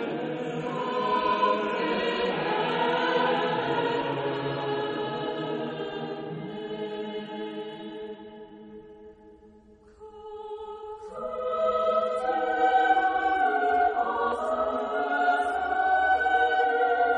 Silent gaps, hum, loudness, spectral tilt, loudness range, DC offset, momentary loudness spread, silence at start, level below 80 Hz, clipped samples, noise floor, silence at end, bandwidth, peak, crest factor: none; none; -27 LUFS; -5.5 dB/octave; 15 LU; under 0.1%; 16 LU; 0 s; -60 dBFS; under 0.1%; -54 dBFS; 0 s; 9.8 kHz; -12 dBFS; 16 dB